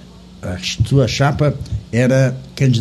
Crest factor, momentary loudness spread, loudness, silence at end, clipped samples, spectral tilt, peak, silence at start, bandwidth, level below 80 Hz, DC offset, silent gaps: 14 dB; 11 LU; -17 LUFS; 0 s; under 0.1%; -6 dB/octave; -2 dBFS; 0.1 s; 12 kHz; -36 dBFS; under 0.1%; none